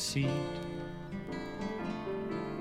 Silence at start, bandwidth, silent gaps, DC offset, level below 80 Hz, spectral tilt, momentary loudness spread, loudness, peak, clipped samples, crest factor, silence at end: 0 s; 15.5 kHz; none; under 0.1%; -56 dBFS; -5 dB/octave; 9 LU; -37 LUFS; -20 dBFS; under 0.1%; 16 dB; 0 s